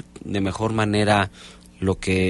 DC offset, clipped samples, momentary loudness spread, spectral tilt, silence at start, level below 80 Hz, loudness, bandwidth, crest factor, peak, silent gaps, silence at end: under 0.1%; under 0.1%; 9 LU; -6 dB/octave; 0.15 s; -46 dBFS; -22 LUFS; 11.5 kHz; 16 dB; -6 dBFS; none; 0 s